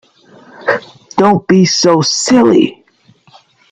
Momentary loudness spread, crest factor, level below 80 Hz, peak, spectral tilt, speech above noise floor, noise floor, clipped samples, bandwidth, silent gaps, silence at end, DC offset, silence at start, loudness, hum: 10 LU; 12 dB; -54 dBFS; 0 dBFS; -4.5 dB/octave; 39 dB; -49 dBFS; under 0.1%; 9.4 kHz; none; 1 s; under 0.1%; 0.6 s; -11 LUFS; none